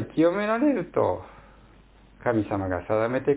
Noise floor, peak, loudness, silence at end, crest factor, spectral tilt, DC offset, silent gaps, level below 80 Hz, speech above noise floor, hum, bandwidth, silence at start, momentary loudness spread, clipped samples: -53 dBFS; -8 dBFS; -25 LUFS; 0 s; 18 dB; -11.5 dB/octave; under 0.1%; none; -50 dBFS; 29 dB; none; 4 kHz; 0 s; 6 LU; under 0.1%